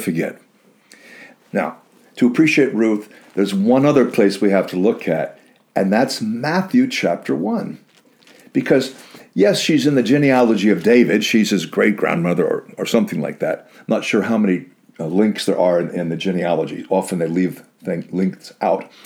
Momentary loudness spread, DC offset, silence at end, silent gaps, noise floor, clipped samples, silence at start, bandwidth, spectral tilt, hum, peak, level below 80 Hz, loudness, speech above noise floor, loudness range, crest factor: 10 LU; under 0.1%; 0.2 s; none; -51 dBFS; under 0.1%; 0 s; 18 kHz; -6 dB/octave; none; -2 dBFS; -66 dBFS; -18 LUFS; 34 dB; 5 LU; 16 dB